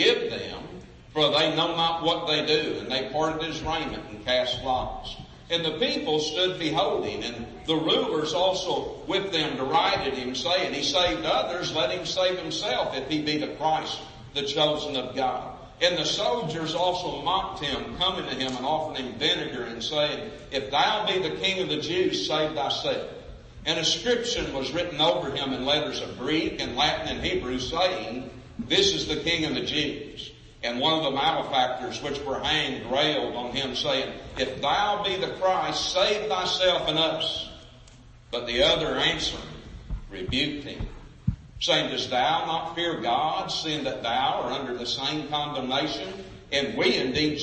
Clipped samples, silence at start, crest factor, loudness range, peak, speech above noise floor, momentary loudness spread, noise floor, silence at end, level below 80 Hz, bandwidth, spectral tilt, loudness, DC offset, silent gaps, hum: under 0.1%; 0 s; 20 dB; 2 LU; -6 dBFS; 23 dB; 11 LU; -50 dBFS; 0 s; -48 dBFS; 8.8 kHz; -3.5 dB/octave; -26 LUFS; under 0.1%; none; none